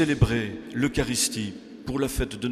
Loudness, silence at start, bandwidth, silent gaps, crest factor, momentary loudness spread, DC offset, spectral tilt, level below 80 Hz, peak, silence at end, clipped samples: -26 LUFS; 0 s; 15.5 kHz; none; 20 dB; 9 LU; under 0.1%; -4.5 dB/octave; -38 dBFS; -6 dBFS; 0 s; under 0.1%